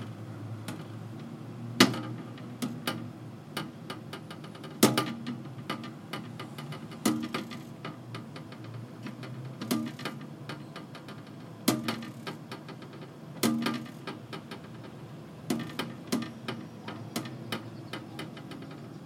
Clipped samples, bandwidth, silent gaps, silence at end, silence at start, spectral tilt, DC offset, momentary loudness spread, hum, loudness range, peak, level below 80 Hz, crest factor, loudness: under 0.1%; 16.5 kHz; none; 0 s; 0 s; -4 dB/octave; under 0.1%; 15 LU; none; 6 LU; -4 dBFS; -74 dBFS; 32 dB; -35 LUFS